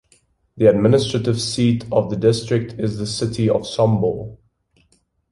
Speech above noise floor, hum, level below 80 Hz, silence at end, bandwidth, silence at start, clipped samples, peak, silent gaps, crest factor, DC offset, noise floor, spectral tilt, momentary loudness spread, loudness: 44 dB; none; -48 dBFS; 0.95 s; 11.5 kHz; 0.55 s; under 0.1%; -2 dBFS; none; 18 dB; under 0.1%; -62 dBFS; -6.5 dB/octave; 8 LU; -19 LUFS